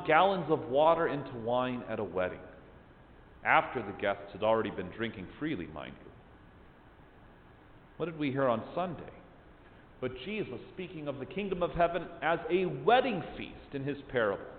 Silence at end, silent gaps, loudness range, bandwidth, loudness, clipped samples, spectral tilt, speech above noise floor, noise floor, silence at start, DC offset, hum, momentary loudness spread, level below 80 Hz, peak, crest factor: 0 s; none; 7 LU; 4.6 kHz; -32 LUFS; under 0.1%; -9.5 dB/octave; 25 dB; -57 dBFS; 0 s; under 0.1%; none; 16 LU; -58 dBFS; -10 dBFS; 24 dB